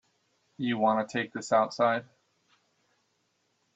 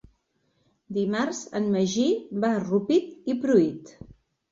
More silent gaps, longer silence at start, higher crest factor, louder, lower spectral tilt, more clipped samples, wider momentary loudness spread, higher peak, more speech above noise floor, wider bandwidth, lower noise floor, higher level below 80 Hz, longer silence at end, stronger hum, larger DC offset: neither; second, 0.6 s vs 0.9 s; about the same, 20 dB vs 18 dB; second, -28 LUFS vs -25 LUFS; about the same, -5 dB/octave vs -5.5 dB/octave; neither; about the same, 8 LU vs 7 LU; second, -12 dBFS vs -8 dBFS; about the same, 47 dB vs 46 dB; about the same, 8.2 kHz vs 7.8 kHz; first, -75 dBFS vs -71 dBFS; second, -78 dBFS vs -64 dBFS; first, 1.7 s vs 0.4 s; neither; neither